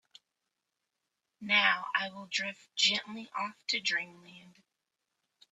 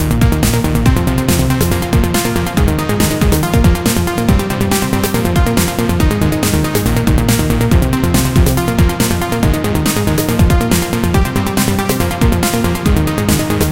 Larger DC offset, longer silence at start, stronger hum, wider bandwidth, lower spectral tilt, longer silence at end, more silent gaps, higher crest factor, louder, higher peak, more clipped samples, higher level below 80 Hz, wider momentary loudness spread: neither; first, 1.4 s vs 0 s; neither; second, 12 kHz vs 17.5 kHz; second, -1 dB/octave vs -5.5 dB/octave; first, 1 s vs 0 s; neither; first, 24 dB vs 12 dB; second, -30 LUFS vs -13 LUFS; second, -12 dBFS vs 0 dBFS; neither; second, -84 dBFS vs -20 dBFS; first, 13 LU vs 2 LU